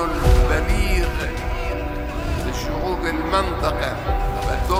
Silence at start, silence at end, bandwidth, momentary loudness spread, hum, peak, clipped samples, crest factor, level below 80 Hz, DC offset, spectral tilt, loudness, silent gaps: 0 s; 0 s; 16 kHz; 7 LU; none; -4 dBFS; under 0.1%; 16 dB; -22 dBFS; under 0.1%; -5.5 dB/octave; -22 LUFS; none